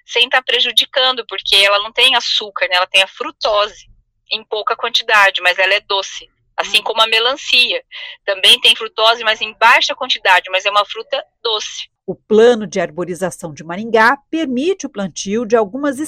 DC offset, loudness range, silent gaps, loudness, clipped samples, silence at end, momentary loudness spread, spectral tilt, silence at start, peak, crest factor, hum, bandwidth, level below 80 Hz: under 0.1%; 5 LU; none; -13 LUFS; under 0.1%; 0 s; 13 LU; -2 dB/octave; 0.1 s; 0 dBFS; 16 dB; none; 16 kHz; -56 dBFS